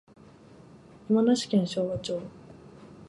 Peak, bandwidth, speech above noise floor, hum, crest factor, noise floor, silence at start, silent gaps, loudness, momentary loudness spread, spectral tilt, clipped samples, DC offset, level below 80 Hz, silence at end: -12 dBFS; 11.5 kHz; 26 dB; none; 18 dB; -52 dBFS; 1.1 s; none; -27 LUFS; 24 LU; -6 dB/octave; under 0.1%; under 0.1%; -62 dBFS; 0.05 s